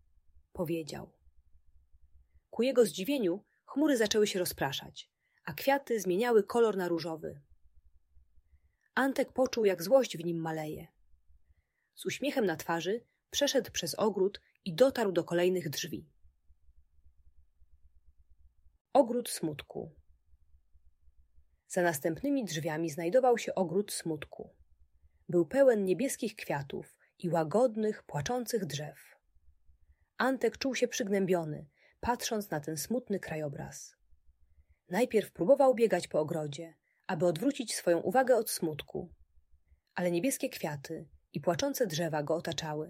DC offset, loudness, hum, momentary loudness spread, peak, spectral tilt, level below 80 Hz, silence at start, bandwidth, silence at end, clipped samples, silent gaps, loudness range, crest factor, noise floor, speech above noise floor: under 0.1%; -32 LUFS; none; 16 LU; -12 dBFS; -4.5 dB/octave; -66 dBFS; 0.55 s; 16 kHz; 0 s; under 0.1%; 18.81-18.85 s; 5 LU; 22 dB; -71 dBFS; 40 dB